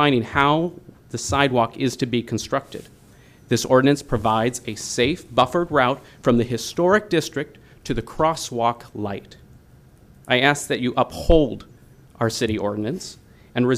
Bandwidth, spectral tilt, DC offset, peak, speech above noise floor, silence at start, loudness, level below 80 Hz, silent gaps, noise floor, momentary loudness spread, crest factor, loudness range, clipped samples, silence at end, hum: 15.5 kHz; -5 dB/octave; under 0.1%; -2 dBFS; 29 dB; 0 s; -21 LUFS; -38 dBFS; none; -50 dBFS; 12 LU; 20 dB; 3 LU; under 0.1%; 0 s; none